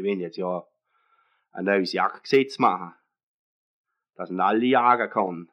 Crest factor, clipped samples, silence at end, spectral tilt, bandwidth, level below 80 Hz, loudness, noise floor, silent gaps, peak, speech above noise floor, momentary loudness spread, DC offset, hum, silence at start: 20 dB; under 0.1%; 0.1 s; -6 dB/octave; 9.8 kHz; under -90 dBFS; -23 LUFS; -67 dBFS; 3.23-3.84 s; -6 dBFS; 44 dB; 14 LU; under 0.1%; none; 0 s